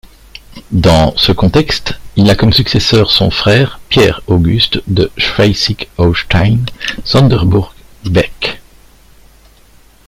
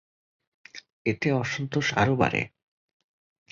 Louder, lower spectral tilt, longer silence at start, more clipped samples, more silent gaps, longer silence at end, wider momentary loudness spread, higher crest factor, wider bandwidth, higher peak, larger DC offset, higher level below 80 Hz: first, -11 LUFS vs -26 LUFS; about the same, -6 dB/octave vs -5.5 dB/octave; second, 0.35 s vs 0.75 s; neither; second, none vs 0.92-1.05 s; first, 1.45 s vs 1.05 s; second, 9 LU vs 23 LU; second, 12 dB vs 22 dB; first, 15.5 kHz vs 7.6 kHz; first, 0 dBFS vs -6 dBFS; neither; first, -28 dBFS vs -56 dBFS